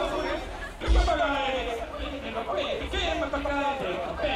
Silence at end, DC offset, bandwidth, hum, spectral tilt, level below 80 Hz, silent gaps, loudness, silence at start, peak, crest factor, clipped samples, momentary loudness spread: 0 s; under 0.1%; 12 kHz; none; -5 dB/octave; -34 dBFS; none; -29 LUFS; 0 s; -10 dBFS; 16 dB; under 0.1%; 9 LU